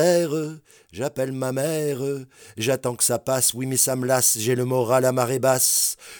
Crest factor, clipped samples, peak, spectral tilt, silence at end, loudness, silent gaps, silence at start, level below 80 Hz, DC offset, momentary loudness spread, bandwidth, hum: 16 dB; under 0.1%; -6 dBFS; -3.5 dB/octave; 0 s; -21 LUFS; none; 0 s; -66 dBFS; under 0.1%; 11 LU; over 20 kHz; none